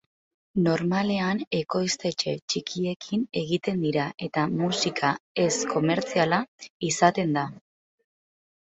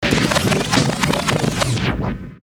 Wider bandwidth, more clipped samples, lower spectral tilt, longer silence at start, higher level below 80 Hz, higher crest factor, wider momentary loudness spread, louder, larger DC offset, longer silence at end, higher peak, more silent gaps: second, 8.4 kHz vs over 20 kHz; neither; about the same, -4.5 dB/octave vs -4.5 dB/octave; first, 0.55 s vs 0 s; second, -64 dBFS vs -34 dBFS; about the same, 20 dB vs 18 dB; about the same, 6 LU vs 5 LU; second, -26 LUFS vs -18 LUFS; neither; first, 1.05 s vs 0.05 s; second, -6 dBFS vs 0 dBFS; first, 1.47-1.51 s, 2.42-2.48 s, 2.96-3.00 s, 5.20-5.35 s, 6.48-6.59 s, 6.70-6.80 s vs none